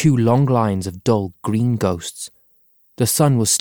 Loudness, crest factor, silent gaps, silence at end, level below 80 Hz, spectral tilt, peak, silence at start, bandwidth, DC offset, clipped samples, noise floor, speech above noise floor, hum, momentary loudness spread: -18 LUFS; 14 dB; none; 0 s; -50 dBFS; -5.5 dB/octave; -4 dBFS; 0 s; over 20 kHz; under 0.1%; under 0.1%; -57 dBFS; 40 dB; none; 12 LU